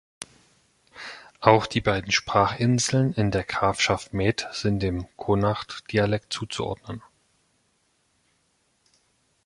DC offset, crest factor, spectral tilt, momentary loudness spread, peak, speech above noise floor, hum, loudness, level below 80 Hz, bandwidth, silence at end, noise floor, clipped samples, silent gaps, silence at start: under 0.1%; 24 dB; -5 dB/octave; 19 LU; -2 dBFS; 45 dB; none; -24 LUFS; -48 dBFS; 11.5 kHz; 2.45 s; -69 dBFS; under 0.1%; none; 0.2 s